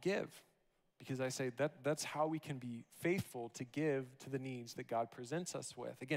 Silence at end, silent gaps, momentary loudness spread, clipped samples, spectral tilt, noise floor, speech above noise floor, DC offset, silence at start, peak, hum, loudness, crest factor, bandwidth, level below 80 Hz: 0 s; none; 9 LU; under 0.1%; -5 dB/octave; -78 dBFS; 37 dB; under 0.1%; 0 s; -24 dBFS; none; -42 LUFS; 18 dB; 16 kHz; -82 dBFS